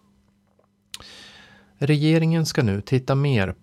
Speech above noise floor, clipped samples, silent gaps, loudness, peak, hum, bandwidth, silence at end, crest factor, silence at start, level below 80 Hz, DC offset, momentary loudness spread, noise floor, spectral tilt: 43 dB; under 0.1%; none; -21 LUFS; -8 dBFS; none; 13.5 kHz; 0.1 s; 16 dB; 1.05 s; -54 dBFS; under 0.1%; 22 LU; -63 dBFS; -6.5 dB/octave